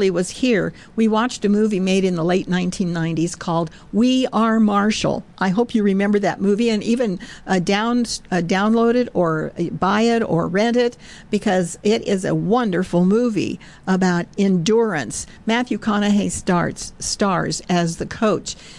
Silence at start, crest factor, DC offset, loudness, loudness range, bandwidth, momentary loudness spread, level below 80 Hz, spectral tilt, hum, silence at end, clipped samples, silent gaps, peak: 0 s; 12 dB; 0.2%; -19 LUFS; 1 LU; 12 kHz; 7 LU; -48 dBFS; -5.5 dB/octave; none; 0 s; under 0.1%; none; -8 dBFS